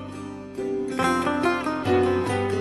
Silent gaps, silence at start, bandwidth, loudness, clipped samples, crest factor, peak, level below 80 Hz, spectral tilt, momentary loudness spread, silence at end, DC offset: none; 0 s; 12.5 kHz; -24 LUFS; under 0.1%; 16 dB; -8 dBFS; -54 dBFS; -6 dB/octave; 13 LU; 0 s; under 0.1%